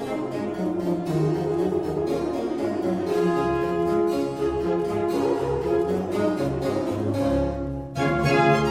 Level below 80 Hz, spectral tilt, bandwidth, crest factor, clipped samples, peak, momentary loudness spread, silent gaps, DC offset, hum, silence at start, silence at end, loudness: -42 dBFS; -7 dB/octave; 15 kHz; 18 dB; under 0.1%; -6 dBFS; 4 LU; none; under 0.1%; none; 0 s; 0 s; -24 LUFS